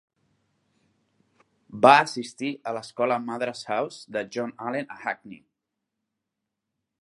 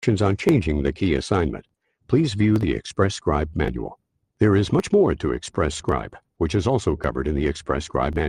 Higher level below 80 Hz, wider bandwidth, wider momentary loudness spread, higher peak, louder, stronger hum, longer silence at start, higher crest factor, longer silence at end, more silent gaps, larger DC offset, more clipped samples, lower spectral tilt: second, -76 dBFS vs -36 dBFS; about the same, 11.5 kHz vs 11 kHz; first, 16 LU vs 7 LU; first, 0 dBFS vs -6 dBFS; second, -25 LUFS vs -22 LUFS; neither; first, 1.7 s vs 0 s; first, 26 dB vs 16 dB; first, 1.65 s vs 0 s; neither; neither; neither; second, -4.5 dB/octave vs -6.5 dB/octave